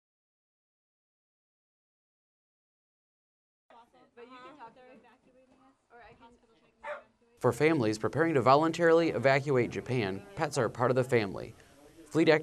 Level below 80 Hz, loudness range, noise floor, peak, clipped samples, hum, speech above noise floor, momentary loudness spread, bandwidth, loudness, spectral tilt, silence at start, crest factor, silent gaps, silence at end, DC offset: -68 dBFS; 13 LU; -59 dBFS; -10 dBFS; under 0.1%; none; 29 dB; 22 LU; 13 kHz; -28 LUFS; -6 dB/octave; 4.2 s; 22 dB; none; 0 s; under 0.1%